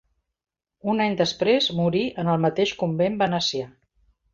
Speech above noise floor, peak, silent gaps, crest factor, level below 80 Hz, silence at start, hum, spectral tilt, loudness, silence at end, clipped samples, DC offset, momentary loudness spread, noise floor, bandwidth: 42 dB; -6 dBFS; none; 18 dB; -60 dBFS; 0.85 s; none; -5.5 dB/octave; -23 LUFS; 0.65 s; under 0.1%; under 0.1%; 6 LU; -65 dBFS; 7.6 kHz